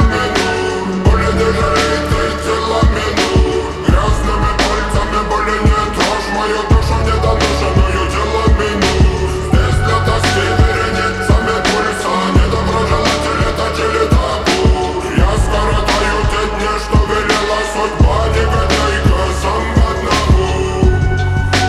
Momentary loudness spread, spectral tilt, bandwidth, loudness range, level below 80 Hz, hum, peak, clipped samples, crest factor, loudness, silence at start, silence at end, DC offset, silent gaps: 3 LU; -5 dB/octave; 13 kHz; 1 LU; -18 dBFS; none; 0 dBFS; under 0.1%; 12 dB; -14 LUFS; 0 s; 0 s; under 0.1%; none